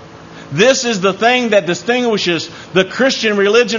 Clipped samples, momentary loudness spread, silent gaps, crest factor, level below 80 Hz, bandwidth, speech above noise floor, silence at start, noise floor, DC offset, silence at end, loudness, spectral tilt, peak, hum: under 0.1%; 6 LU; none; 14 dB; -56 dBFS; 7.4 kHz; 21 dB; 0 s; -35 dBFS; under 0.1%; 0 s; -14 LUFS; -3.5 dB/octave; 0 dBFS; none